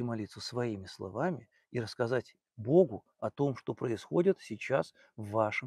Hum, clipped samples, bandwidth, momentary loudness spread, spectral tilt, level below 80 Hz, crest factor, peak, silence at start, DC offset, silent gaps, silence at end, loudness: none; under 0.1%; 12 kHz; 13 LU; -7 dB/octave; -72 dBFS; 20 dB; -12 dBFS; 0 s; under 0.1%; none; 0 s; -33 LUFS